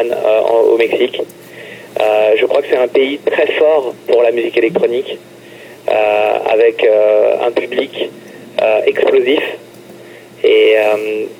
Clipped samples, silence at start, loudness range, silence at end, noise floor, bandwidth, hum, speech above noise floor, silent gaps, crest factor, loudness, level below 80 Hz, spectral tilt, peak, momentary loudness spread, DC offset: under 0.1%; 0 s; 2 LU; 0.05 s; -36 dBFS; 16 kHz; none; 23 dB; none; 14 dB; -13 LUFS; -62 dBFS; -4.5 dB/octave; 0 dBFS; 14 LU; under 0.1%